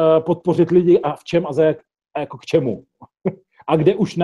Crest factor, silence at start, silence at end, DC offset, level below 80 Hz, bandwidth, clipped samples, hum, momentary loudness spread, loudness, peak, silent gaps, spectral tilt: 16 dB; 0 s; 0 s; under 0.1%; -56 dBFS; 10 kHz; under 0.1%; none; 14 LU; -18 LUFS; -2 dBFS; none; -8 dB/octave